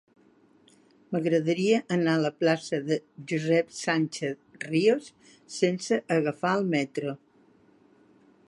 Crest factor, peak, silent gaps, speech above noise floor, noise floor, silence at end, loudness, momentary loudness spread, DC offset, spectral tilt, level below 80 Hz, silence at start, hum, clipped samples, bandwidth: 18 dB; -10 dBFS; none; 34 dB; -61 dBFS; 1.3 s; -27 LUFS; 9 LU; under 0.1%; -5.5 dB/octave; -76 dBFS; 1.1 s; none; under 0.1%; 11.5 kHz